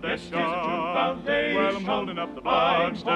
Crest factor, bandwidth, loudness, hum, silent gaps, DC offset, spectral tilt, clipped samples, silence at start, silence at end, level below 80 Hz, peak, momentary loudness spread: 16 dB; 10.5 kHz; -25 LUFS; none; none; under 0.1%; -5.5 dB/octave; under 0.1%; 0 s; 0 s; -54 dBFS; -10 dBFS; 6 LU